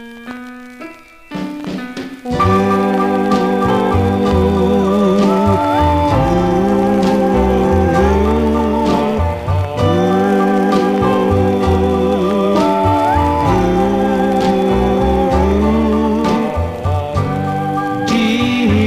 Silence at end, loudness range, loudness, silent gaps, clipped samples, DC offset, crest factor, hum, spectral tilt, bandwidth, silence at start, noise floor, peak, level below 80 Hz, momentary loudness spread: 0 s; 3 LU; -14 LUFS; none; under 0.1%; 0.2%; 12 dB; none; -7.5 dB/octave; 15.5 kHz; 0 s; -34 dBFS; -2 dBFS; -26 dBFS; 10 LU